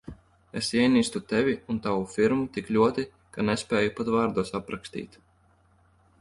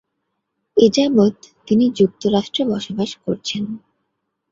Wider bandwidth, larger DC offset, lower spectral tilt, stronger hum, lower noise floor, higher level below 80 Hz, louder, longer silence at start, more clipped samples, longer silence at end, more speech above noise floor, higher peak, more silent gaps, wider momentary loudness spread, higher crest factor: first, 11.5 kHz vs 7.6 kHz; neither; about the same, -5 dB/octave vs -6 dB/octave; neither; second, -63 dBFS vs -74 dBFS; about the same, -56 dBFS vs -56 dBFS; second, -26 LUFS vs -18 LUFS; second, 0.05 s vs 0.75 s; neither; first, 1.15 s vs 0.75 s; second, 37 dB vs 57 dB; second, -8 dBFS vs -2 dBFS; neither; first, 14 LU vs 10 LU; about the same, 18 dB vs 18 dB